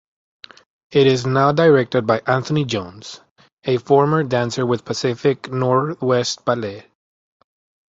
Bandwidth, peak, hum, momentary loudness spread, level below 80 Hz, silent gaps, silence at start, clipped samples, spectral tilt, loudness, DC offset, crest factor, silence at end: 8 kHz; -2 dBFS; none; 12 LU; -56 dBFS; 3.31-3.36 s, 3.53-3.57 s; 0.9 s; under 0.1%; -6 dB/octave; -18 LUFS; under 0.1%; 18 dB; 1.1 s